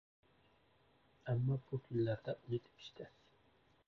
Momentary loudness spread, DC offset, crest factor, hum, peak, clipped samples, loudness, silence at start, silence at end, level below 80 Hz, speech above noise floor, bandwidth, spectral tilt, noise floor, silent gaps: 18 LU; under 0.1%; 16 dB; none; -28 dBFS; under 0.1%; -41 LUFS; 1.25 s; 0.8 s; -70 dBFS; 33 dB; 6.2 kHz; -8 dB/octave; -73 dBFS; none